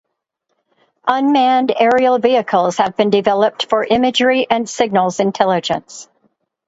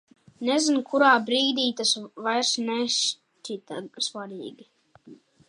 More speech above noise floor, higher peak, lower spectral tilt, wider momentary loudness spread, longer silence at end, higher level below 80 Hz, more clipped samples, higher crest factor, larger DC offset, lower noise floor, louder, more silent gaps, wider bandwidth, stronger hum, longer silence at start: first, 57 dB vs 26 dB; first, 0 dBFS vs -6 dBFS; first, -4.5 dB/octave vs -1.5 dB/octave; second, 6 LU vs 18 LU; first, 0.65 s vs 0.35 s; first, -58 dBFS vs -80 dBFS; neither; about the same, 16 dB vs 20 dB; neither; first, -72 dBFS vs -51 dBFS; first, -15 LUFS vs -24 LUFS; neither; second, 8 kHz vs 11.5 kHz; neither; first, 1.05 s vs 0.4 s